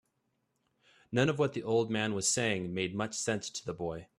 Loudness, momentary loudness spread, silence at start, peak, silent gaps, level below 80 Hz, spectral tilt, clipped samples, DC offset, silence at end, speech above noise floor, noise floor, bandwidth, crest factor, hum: -32 LUFS; 9 LU; 1.1 s; -14 dBFS; none; -66 dBFS; -4 dB/octave; under 0.1%; under 0.1%; 0.15 s; 47 dB; -79 dBFS; 14.5 kHz; 20 dB; none